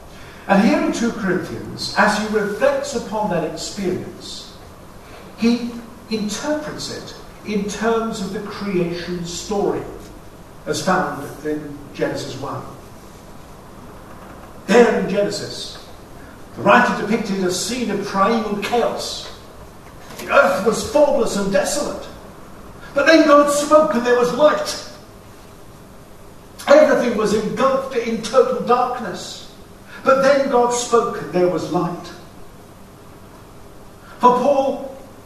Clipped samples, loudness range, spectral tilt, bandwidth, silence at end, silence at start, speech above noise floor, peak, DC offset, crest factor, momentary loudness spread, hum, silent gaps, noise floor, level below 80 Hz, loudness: under 0.1%; 9 LU; -4.5 dB/octave; 13.5 kHz; 0 s; 0 s; 23 dB; 0 dBFS; under 0.1%; 20 dB; 23 LU; none; none; -41 dBFS; -46 dBFS; -18 LUFS